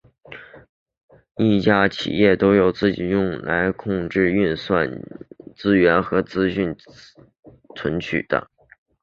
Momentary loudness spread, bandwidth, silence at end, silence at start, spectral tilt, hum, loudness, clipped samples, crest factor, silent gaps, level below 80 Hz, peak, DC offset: 22 LU; 7.2 kHz; 0.6 s; 0.3 s; -7.5 dB/octave; none; -20 LUFS; under 0.1%; 20 dB; 0.69-0.86 s, 0.97-1.08 s, 7.39-7.43 s; -48 dBFS; -2 dBFS; under 0.1%